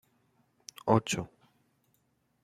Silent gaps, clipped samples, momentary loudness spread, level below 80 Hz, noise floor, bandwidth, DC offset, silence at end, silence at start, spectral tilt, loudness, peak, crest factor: none; under 0.1%; 22 LU; -66 dBFS; -74 dBFS; 15 kHz; under 0.1%; 1.15 s; 0.85 s; -5 dB/octave; -30 LUFS; -8 dBFS; 26 dB